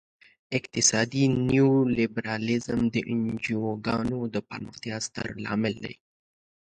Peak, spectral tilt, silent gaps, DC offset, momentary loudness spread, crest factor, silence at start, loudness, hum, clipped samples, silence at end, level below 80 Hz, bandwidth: -6 dBFS; -4.5 dB/octave; none; under 0.1%; 12 LU; 20 dB; 0.5 s; -26 LUFS; none; under 0.1%; 0.75 s; -56 dBFS; 9.4 kHz